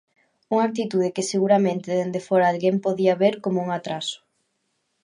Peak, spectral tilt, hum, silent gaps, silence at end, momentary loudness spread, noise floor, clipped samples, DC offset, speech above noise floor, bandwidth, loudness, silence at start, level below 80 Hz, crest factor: -6 dBFS; -5.5 dB/octave; none; none; 0.85 s; 8 LU; -73 dBFS; under 0.1%; under 0.1%; 52 dB; 11 kHz; -22 LUFS; 0.5 s; -74 dBFS; 18 dB